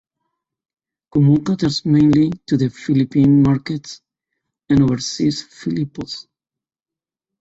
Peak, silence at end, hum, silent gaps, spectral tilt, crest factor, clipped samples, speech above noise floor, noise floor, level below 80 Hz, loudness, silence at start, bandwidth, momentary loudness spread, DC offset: -4 dBFS; 1.2 s; none; none; -7 dB/octave; 14 dB; under 0.1%; 73 dB; -89 dBFS; -48 dBFS; -17 LUFS; 1.15 s; 8 kHz; 14 LU; under 0.1%